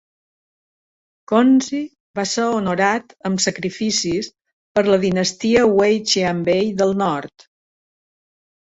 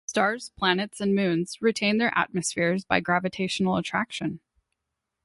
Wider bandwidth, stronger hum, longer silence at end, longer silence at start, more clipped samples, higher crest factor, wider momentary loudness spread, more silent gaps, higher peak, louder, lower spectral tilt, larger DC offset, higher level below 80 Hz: second, 8.4 kHz vs 11.5 kHz; neither; first, 1.35 s vs 0.9 s; first, 1.3 s vs 0.1 s; neither; about the same, 16 dB vs 20 dB; first, 11 LU vs 5 LU; first, 2.00-2.14 s, 4.53-4.75 s vs none; first, -2 dBFS vs -6 dBFS; first, -18 LUFS vs -25 LUFS; about the same, -4 dB/octave vs -4.5 dB/octave; neither; first, -54 dBFS vs -62 dBFS